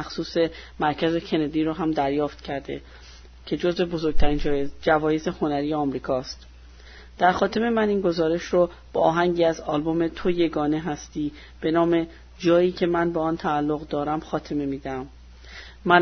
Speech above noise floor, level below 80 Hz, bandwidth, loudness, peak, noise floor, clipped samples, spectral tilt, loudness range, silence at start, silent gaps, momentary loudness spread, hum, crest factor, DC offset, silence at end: 22 dB; -38 dBFS; 6.6 kHz; -24 LUFS; -4 dBFS; -45 dBFS; under 0.1%; -6.5 dB/octave; 3 LU; 0 s; none; 11 LU; none; 20 dB; under 0.1%; 0 s